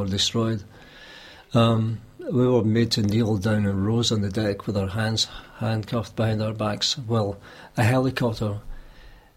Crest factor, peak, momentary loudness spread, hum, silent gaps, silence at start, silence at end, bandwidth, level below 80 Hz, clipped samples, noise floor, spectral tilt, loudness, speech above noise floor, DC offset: 18 dB; -6 dBFS; 11 LU; none; none; 0 s; 0.25 s; 15 kHz; -48 dBFS; under 0.1%; -47 dBFS; -5.5 dB/octave; -24 LUFS; 24 dB; under 0.1%